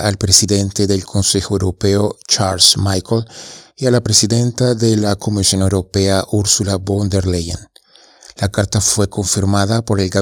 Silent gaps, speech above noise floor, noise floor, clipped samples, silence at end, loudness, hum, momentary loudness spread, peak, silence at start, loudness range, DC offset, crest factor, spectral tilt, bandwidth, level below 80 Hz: none; 32 dB; -47 dBFS; under 0.1%; 0 s; -14 LUFS; none; 10 LU; 0 dBFS; 0 s; 4 LU; under 0.1%; 16 dB; -4 dB/octave; 19 kHz; -40 dBFS